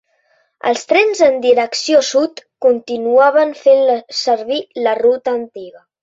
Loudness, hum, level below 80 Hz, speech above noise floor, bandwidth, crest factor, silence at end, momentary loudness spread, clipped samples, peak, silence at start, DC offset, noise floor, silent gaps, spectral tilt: -14 LUFS; none; -64 dBFS; 46 dB; 8 kHz; 14 dB; 0.3 s; 10 LU; under 0.1%; 0 dBFS; 0.65 s; under 0.1%; -60 dBFS; none; -2 dB/octave